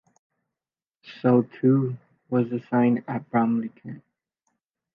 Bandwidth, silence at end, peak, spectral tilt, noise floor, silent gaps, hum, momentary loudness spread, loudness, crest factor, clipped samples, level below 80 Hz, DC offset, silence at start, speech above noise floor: 5.2 kHz; 0.95 s; -8 dBFS; -10.5 dB/octave; under -90 dBFS; none; none; 19 LU; -24 LUFS; 18 dB; under 0.1%; -74 dBFS; under 0.1%; 1.05 s; over 67 dB